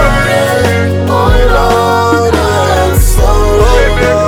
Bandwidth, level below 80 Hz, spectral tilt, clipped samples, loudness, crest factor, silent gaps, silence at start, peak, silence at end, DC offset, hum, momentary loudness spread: 17 kHz; -12 dBFS; -5 dB/octave; 0.4%; -9 LUFS; 8 dB; none; 0 s; 0 dBFS; 0 s; under 0.1%; none; 2 LU